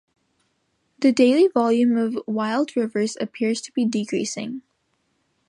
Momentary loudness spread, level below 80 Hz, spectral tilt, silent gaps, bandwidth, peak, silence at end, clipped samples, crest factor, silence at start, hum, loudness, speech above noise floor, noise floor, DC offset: 10 LU; -72 dBFS; -5 dB/octave; none; 11 kHz; -6 dBFS; 0.9 s; under 0.1%; 18 dB; 1 s; none; -21 LUFS; 50 dB; -70 dBFS; under 0.1%